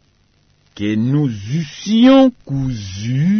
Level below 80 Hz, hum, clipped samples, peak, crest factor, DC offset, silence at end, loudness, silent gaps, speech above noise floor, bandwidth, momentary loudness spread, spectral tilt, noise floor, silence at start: -46 dBFS; none; under 0.1%; -2 dBFS; 14 dB; under 0.1%; 0 s; -16 LUFS; none; 42 dB; 6.6 kHz; 13 LU; -7 dB/octave; -57 dBFS; 0.75 s